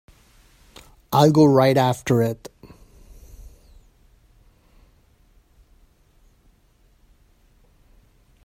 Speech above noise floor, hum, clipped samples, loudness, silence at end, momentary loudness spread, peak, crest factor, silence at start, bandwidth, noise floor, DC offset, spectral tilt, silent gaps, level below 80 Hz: 42 dB; none; under 0.1%; -18 LUFS; 5.05 s; 16 LU; -2 dBFS; 22 dB; 1.1 s; 16 kHz; -58 dBFS; under 0.1%; -7 dB/octave; none; -52 dBFS